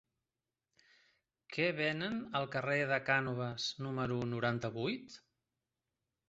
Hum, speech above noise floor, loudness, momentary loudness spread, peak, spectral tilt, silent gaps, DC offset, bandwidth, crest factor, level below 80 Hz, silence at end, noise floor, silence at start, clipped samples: none; over 54 dB; -36 LUFS; 7 LU; -16 dBFS; -3.5 dB/octave; none; under 0.1%; 8 kHz; 22 dB; -70 dBFS; 1.1 s; under -90 dBFS; 1.5 s; under 0.1%